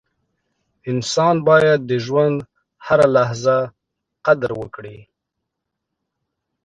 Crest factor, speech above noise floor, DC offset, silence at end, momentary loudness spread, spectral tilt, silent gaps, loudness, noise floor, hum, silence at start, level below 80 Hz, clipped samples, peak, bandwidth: 18 dB; 63 dB; under 0.1%; 1.6 s; 17 LU; -5.5 dB/octave; none; -17 LUFS; -79 dBFS; none; 0.85 s; -58 dBFS; under 0.1%; 0 dBFS; 10 kHz